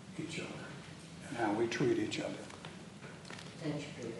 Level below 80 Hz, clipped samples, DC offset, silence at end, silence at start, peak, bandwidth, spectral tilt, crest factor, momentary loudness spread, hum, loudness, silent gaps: -72 dBFS; under 0.1%; under 0.1%; 0 s; 0 s; -22 dBFS; 11.5 kHz; -5 dB/octave; 18 dB; 16 LU; none; -39 LUFS; none